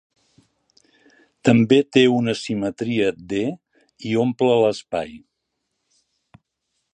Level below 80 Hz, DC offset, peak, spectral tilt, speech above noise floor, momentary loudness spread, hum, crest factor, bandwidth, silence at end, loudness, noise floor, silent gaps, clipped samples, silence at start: -60 dBFS; under 0.1%; -2 dBFS; -6 dB/octave; 58 dB; 13 LU; none; 20 dB; 9.6 kHz; 1.75 s; -20 LUFS; -77 dBFS; none; under 0.1%; 1.45 s